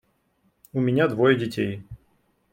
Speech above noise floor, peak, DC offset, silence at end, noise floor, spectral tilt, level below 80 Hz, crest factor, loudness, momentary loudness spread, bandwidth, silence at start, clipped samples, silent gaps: 46 dB; -4 dBFS; under 0.1%; 0.55 s; -68 dBFS; -7.5 dB/octave; -58 dBFS; 20 dB; -23 LUFS; 12 LU; 16.5 kHz; 0.75 s; under 0.1%; none